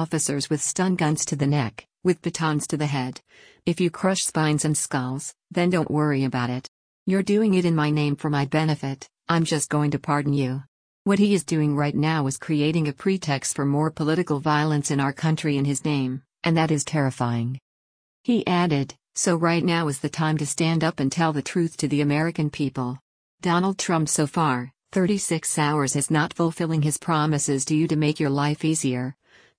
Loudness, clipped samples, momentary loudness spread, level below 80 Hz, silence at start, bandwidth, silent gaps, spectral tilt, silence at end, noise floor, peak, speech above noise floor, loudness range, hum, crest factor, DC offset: -23 LUFS; under 0.1%; 7 LU; -60 dBFS; 0 s; 10.5 kHz; 6.68-7.06 s, 10.68-11.05 s, 17.62-18.24 s, 23.01-23.38 s; -5 dB/octave; 0.45 s; under -90 dBFS; -6 dBFS; over 67 dB; 2 LU; none; 16 dB; under 0.1%